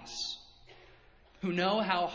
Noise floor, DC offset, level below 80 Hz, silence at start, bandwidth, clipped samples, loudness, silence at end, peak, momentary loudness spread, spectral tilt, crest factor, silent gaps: -60 dBFS; under 0.1%; -66 dBFS; 0 s; 8 kHz; under 0.1%; -32 LUFS; 0 s; -14 dBFS; 10 LU; -4.5 dB/octave; 22 dB; none